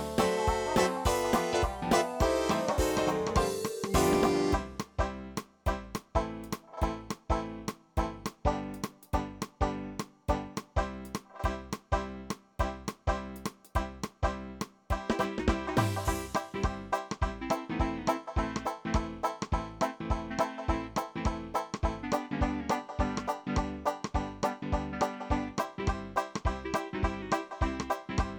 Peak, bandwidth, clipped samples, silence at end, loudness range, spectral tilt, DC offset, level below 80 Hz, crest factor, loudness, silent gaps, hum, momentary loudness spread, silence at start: -14 dBFS; 19.5 kHz; under 0.1%; 0 s; 7 LU; -5.5 dB/octave; under 0.1%; -40 dBFS; 18 dB; -33 LUFS; none; none; 9 LU; 0 s